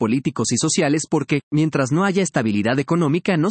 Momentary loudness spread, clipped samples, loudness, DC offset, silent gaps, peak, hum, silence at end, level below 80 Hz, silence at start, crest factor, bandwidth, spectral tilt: 3 LU; under 0.1%; -19 LUFS; under 0.1%; 1.43-1.51 s; -6 dBFS; none; 0 s; -60 dBFS; 0 s; 14 dB; 8.8 kHz; -5 dB/octave